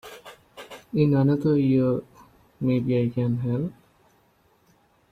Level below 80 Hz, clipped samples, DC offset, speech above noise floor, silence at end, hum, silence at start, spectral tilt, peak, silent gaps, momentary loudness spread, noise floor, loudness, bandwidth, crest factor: -58 dBFS; under 0.1%; under 0.1%; 41 dB; 1.4 s; none; 0.05 s; -9.5 dB/octave; -8 dBFS; none; 22 LU; -63 dBFS; -24 LUFS; 13.5 kHz; 16 dB